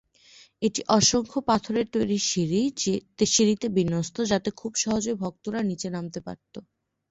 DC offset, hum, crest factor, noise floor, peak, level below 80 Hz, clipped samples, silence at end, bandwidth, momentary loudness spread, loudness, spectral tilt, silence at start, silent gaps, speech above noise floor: under 0.1%; none; 20 dB; -55 dBFS; -6 dBFS; -56 dBFS; under 0.1%; 0.5 s; 8.2 kHz; 13 LU; -25 LUFS; -4 dB/octave; 0.6 s; none; 29 dB